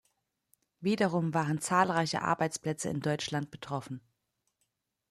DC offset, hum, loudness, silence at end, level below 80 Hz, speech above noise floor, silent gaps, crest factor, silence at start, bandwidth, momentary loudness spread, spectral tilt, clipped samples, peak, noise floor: under 0.1%; none; -31 LUFS; 1.1 s; -70 dBFS; 50 dB; none; 22 dB; 0.8 s; 13.5 kHz; 11 LU; -5 dB/octave; under 0.1%; -12 dBFS; -81 dBFS